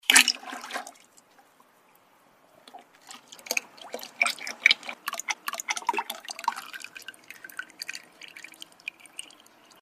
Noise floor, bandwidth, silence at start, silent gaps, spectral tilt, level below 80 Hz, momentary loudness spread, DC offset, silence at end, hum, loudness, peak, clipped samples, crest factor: -61 dBFS; 15.5 kHz; 0.1 s; none; 2.5 dB/octave; -84 dBFS; 23 LU; under 0.1%; 0.6 s; none; -27 LUFS; 0 dBFS; under 0.1%; 32 dB